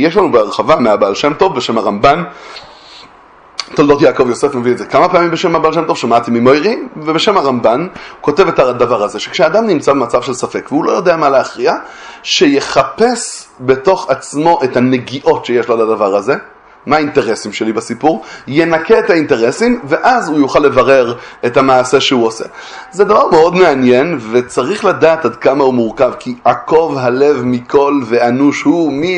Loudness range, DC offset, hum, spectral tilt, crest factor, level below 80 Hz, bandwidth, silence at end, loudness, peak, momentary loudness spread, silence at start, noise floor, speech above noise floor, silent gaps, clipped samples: 3 LU; under 0.1%; none; -5 dB/octave; 12 dB; -46 dBFS; 11 kHz; 0 s; -11 LUFS; 0 dBFS; 8 LU; 0 s; -41 dBFS; 29 dB; none; 0.2%